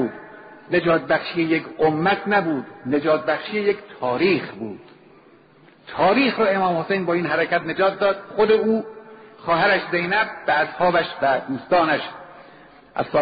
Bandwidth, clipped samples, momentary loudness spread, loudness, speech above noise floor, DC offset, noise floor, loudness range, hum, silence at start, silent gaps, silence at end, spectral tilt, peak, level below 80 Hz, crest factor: 5 kHz; under 0.1%; 13 LU; -21 LUFS; 31 dB; under 0.1%; -51 dBFS; 3 LU; none; 0 s; none; 0 s; -3.5 dB/octave; -6 dBFS; -58 dBFS; 14 dB